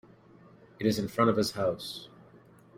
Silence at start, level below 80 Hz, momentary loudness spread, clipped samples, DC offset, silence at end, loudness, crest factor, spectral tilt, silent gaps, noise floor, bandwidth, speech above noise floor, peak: 0.8 s; -64 dBFS; 16 LU; under 0.1%; under 0.1%; 0.7 s; -29 LUFS; 22 dB; -5.5 dB/octave; none; -56 dBFS; 16 kHz; 28 dB; -10 dBFS